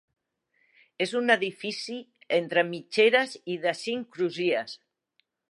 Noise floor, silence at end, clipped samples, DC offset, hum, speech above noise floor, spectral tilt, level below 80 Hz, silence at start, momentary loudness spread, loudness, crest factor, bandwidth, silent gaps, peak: -74 dBFS; 0.75 s; under 0.1%; under 0.1%; none; 47 dB; -4 dB/octave; -82 dBFS; 1 s; 13 LU; -27 LUFS; 22 dB; 11.5 kHz; none; -8 dBFS